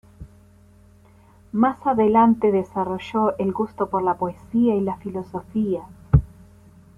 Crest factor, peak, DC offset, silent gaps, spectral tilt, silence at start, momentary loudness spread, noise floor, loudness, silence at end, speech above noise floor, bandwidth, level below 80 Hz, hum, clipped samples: 20 dB; -4 dBFS; under 0.1%; none; -9.5 dB/octave; 0.2 s; 12 LU; -51 dBFS; -22 LUFS; 0.7 s; 30 dB; 7 kHz; -38 dBFS; none; under 0.1%